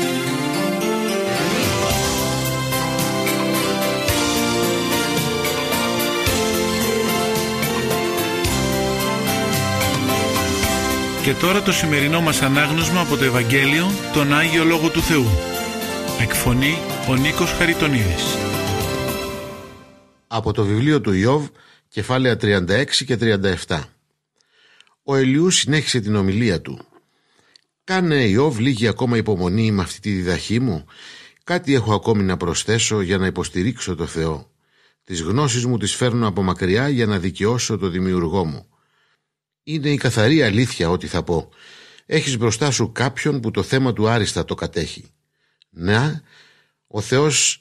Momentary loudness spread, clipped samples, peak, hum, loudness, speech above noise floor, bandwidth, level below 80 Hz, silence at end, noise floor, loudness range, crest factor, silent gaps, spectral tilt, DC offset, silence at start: 8 LU; under 0.1%; -2 dBFS; none; -19 LUFS; 60 dB; 15 kHz; -40 dBFS; 0.05 s; -78 dBFS; 4 LU; 18 dB; none; -4.5 dB/octave; under 0.1%; 0 s